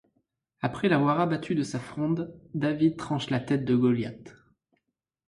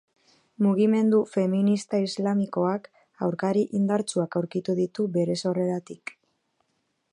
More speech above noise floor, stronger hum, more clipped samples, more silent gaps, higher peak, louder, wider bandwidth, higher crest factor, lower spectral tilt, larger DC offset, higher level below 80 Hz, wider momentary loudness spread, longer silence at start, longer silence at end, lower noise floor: first, 54 dB vs 50 dB; neither; neither; neither; about the same, -12 dBFS vs -10 dBFS; about the same, -27 LUFS vs -25 LUFS; about the same, 11.5 kHz vs 11 kHz; about the same, 16 dB vs 16 dB; about the same, -7 dB/octave vs -7 dB/octave; neither; first, -62 dBFS vs -74 dBFS; about the same, 10 LU vs 9 LU; about the same, 0.6 s vs 0.6 s; second, 1 s vs 1.15 s; first, -80 dBFS vs -74 dBFS